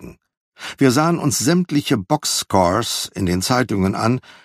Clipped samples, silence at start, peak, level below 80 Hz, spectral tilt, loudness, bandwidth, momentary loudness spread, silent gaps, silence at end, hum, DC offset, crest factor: under 0.1%; 0 s; 0 dBFS; -50 dBFS; -4.5 dB/octave; -18 LUFS; 15.5 kHz; 5 LU; 0.37-0.52 s; 0.15 s; none; under 0.1%; 18 dB